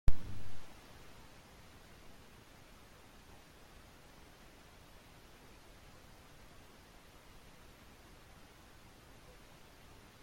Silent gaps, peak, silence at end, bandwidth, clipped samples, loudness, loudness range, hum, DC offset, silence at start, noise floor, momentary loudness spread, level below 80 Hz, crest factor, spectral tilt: none; -14 dBFS; 9.5 s; 16 kHz; under 0.1%; -56 LUFS; 2 LU; none; under 0.1%; 0.05 s; -59 dBFS; 3 LU; -48 dBFS; 24 dB; -5 dB/octave